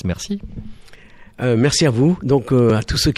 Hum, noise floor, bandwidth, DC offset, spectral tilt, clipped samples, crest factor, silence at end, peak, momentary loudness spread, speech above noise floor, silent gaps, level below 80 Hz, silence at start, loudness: none; -42 dBFS; 13.5 kHz; under 0.1%; -5.5 dB/octave; under 0.1%; 14 dB; 0.05 s; -4 dBFS; 13 LU; 25 dB; none; -36 dBFS; 0.05 s; -17 LUFS